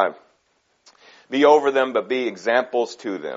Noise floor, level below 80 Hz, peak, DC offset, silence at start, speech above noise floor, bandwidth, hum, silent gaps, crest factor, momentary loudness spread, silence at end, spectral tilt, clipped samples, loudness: -66 dBFS; -78 dBFS; -2 dBFS; under 0.1%; 0 s; 47 dB; 7.8 kHz; none; none; 20 dB; 12 LU; 0 s; -1.5 dB/octave; under 0.1%; -20 LUFS